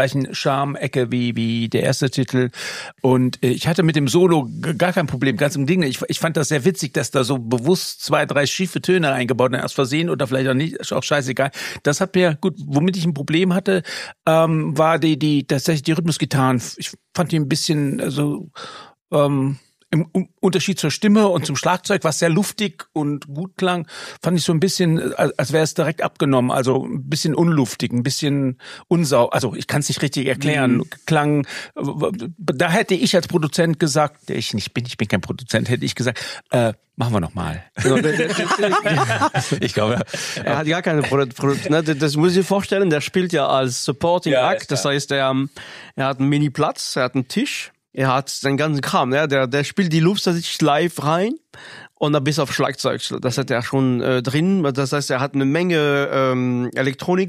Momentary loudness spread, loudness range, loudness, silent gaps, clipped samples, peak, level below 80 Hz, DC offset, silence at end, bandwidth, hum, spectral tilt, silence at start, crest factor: 7 LU; 3 LU; -19 LUFS; 19.01-19.05 s; under 0.1%; -2 dBFS; -56 dBFS; under 0.1%; 0 s; 15.5 kHz; none; -5.5 dB/octave; 0 s; 16 dB